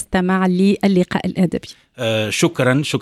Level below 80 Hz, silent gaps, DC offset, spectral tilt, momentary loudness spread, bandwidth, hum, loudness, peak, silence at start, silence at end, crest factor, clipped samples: -46 dBFS; none; under 0.1%; -5.5 dB/octave; 7 LU; 14 kHz; none; -17 LUFS; -2 dBFS; 0 s; 0 s; 14 dB; under 0.1%